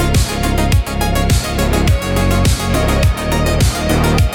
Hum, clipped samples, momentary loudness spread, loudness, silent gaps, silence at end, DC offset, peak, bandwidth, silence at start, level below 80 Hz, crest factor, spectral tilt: none; under 0.1%; 2 LU; -15 LUFS; none; 0 s; under 0.1%; -2 dBFS; 18 kHz; 0 s; -18 dBFS; 10 dB; -5 dB/octave